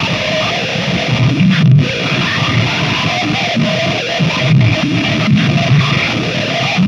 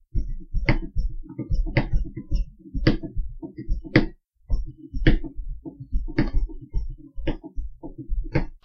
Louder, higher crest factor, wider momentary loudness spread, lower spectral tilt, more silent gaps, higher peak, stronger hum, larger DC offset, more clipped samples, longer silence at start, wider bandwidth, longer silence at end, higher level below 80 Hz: first, -13 LUFS vs -29 LUFS; second, 12 dB vs 22 dB; second, 4 LU vs 15 LU; second, -5.5 dB/octave vs -8.5 dB/octave; neither; about the same, 0 dBFS vs -2 dBFS; neither; neither; neither; second, 0 s vs 0.15 s; first, 10 kHz vs 6 kHz; about the same, 0 s vs 0.1 s; second, -40 dBFS vs -26 dBFS